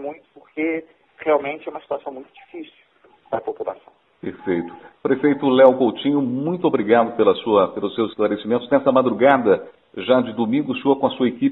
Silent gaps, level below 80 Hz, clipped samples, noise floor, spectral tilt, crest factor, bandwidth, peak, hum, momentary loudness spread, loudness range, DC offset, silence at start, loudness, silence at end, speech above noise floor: none; -62 dBFS; under 0.1%; -55 dBFS; -9.5 dB/octave; 20 dB; 4.1 kHz; 0 dBFS; none; 18 LU; 10 LU; under 0.1%; 0 s; -19 LUFS; 0 s; 35 dB